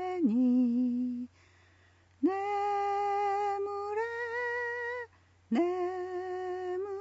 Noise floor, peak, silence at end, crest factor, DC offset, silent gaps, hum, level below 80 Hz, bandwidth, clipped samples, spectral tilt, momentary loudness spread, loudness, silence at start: -63 dBFS; -18 dBFS; 0 s; 14 dB; under 0.1%; none; none; -76 dBFS; 7.8 kHz; under 0.1%; -6.5 dB/octave; 9 LU; -32 LUFS; 0 s